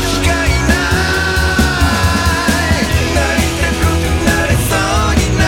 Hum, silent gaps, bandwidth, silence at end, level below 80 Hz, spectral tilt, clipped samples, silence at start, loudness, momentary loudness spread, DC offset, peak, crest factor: none; none; 17.5 kHz; 0 s; -20 dBFS; -4.5 dB/octave; under 0.1%; 0 s; -13 LUFS; 1 LU; under 0.1%; 0 dBFS; 12 dB